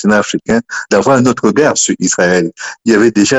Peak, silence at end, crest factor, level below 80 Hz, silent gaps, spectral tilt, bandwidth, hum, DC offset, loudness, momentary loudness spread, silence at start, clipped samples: 0 dBFS; 0 s; 12 dB; -46 dBFS; none; -4 dB/octave; 9.6 kHz; none; under 0.1%; -12 LUFS; 6 LU; 0 s; under 0.1%